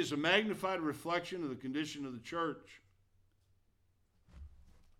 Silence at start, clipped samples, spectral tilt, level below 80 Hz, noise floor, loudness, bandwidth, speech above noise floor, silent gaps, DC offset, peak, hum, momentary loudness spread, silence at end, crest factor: 0 s; under 0.1%; -4.5 dB/octave; -64 dBFS; -74 dBFS; -36 LUFS; 16.5 kHz; 37 dB; none; under 0.1%; -14 dBFS; none; 11 LU; 0.3 s; 24 dB